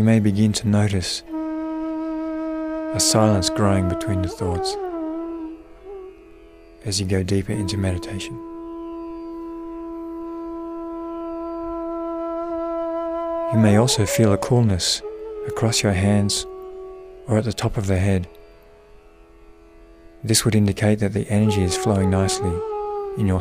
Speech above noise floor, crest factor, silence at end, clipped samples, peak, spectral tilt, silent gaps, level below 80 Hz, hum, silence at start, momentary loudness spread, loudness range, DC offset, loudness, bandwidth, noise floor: 28 dB; 18 dB; 0 s; under 0.1%; -4 dBFS; -5 dB/octave; none; -44 dBFS; none; 0 s; 15 LU; 9 LU; under 0.1%; -22 LUFS; 15.5 kHz; -48 dBFS